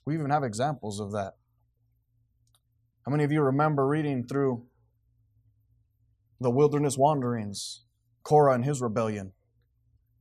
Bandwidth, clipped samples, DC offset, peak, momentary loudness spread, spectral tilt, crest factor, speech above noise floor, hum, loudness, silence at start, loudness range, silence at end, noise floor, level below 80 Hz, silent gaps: 13.5 kHz; under 0.1%; under 0.1%; -10 dBFS; 14 LU; -6.5 dB/octave; 20 dB; 45 dB; none; -27 LUFS; 0.05 s; 5 LU; 0.9 s; -71 dBFS; -68 dBFS; none